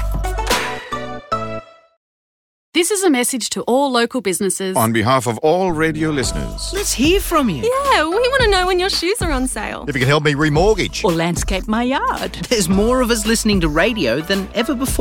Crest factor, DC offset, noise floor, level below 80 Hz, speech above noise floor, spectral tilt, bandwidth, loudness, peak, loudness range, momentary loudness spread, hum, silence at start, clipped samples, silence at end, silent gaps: 14 dB; under 0.1%; under -90 dBFS; -30 dBFS; over 73 dB; -4 dB/octave; 18 kHz; -17 LUFS; -4 dBFS; 3 LU; 8 LU; none; 0 s; under 0.1%; 0 s; 1.97-2.72 s